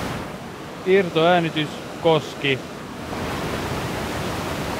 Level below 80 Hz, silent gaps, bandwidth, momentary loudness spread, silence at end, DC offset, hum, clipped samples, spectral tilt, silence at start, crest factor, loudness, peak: -44 dBFS; none; 16 kHz; 15 LU; 0 s; under 0.1%; none; under 0.1%; -5 dB/octave; 0 s; 18 dB; -23 LUFS; -6 dBFS